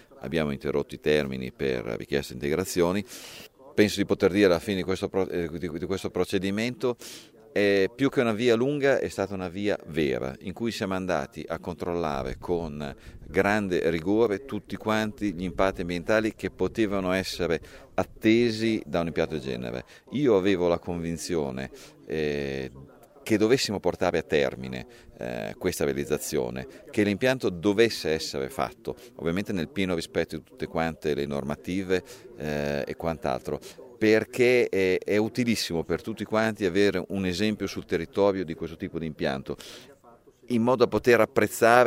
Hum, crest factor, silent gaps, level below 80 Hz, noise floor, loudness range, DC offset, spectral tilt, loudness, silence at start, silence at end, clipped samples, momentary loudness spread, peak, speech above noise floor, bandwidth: none; 24 dB; none; -52 dBFS; -55 dBFS; 4 LU; under 0.1%; -5.5 dB/octave; -27 LUFS; 0.1 s; 0 s; under 0.1%; 12 LU; -4 dBFS; 29 dB; 16 kHz